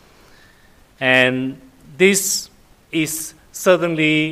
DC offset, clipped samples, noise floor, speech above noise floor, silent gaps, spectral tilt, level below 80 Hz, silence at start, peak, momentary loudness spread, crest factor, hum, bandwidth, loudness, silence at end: under 0.1%; under 0.1%; -50 dBFS; 33 dB; none; -3.5 dB/octave; -56 dBFS; 1 s; 0 dBFS; 13 LU; 18 dB; none; 16 kHz; -17 LUFS; 0 s